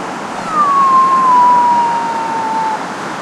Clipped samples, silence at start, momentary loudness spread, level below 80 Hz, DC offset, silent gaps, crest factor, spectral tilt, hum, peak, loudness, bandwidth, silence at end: under 0.1%; 0 s; 12 LU; -58 dBFS; under 0.1%; none; 10 dB; -4 dB/octave; none; -2 dBFS; -12 LUFS; 12 kHz; 0 s